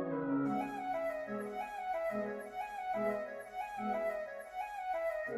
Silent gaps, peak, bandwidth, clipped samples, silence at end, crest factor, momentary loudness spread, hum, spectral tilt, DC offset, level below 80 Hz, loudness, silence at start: none; -24 dBFS; 15 kHz; under 0.1%; 0 s; 14 dB; 7 LU; none; -6.5 dB/octave; under 0.1%; -70 dBFS; -39 LUFS; 0 s